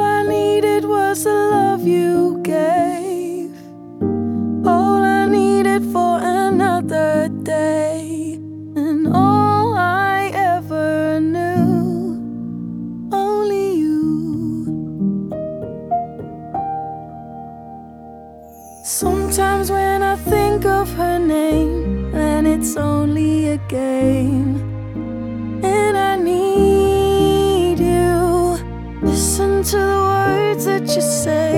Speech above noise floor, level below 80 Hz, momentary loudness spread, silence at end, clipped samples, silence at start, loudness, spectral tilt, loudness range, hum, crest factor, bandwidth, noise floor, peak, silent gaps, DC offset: 23 dB; -34 dBFS; 13 LU; 0 s; under 0.1%; 0 s; -17 LUFS; -5.5 dB/octave; 7 LU; none; 14 dB; 18 kHz; -38 dBFS; -2 dBFS; none; under 0.1%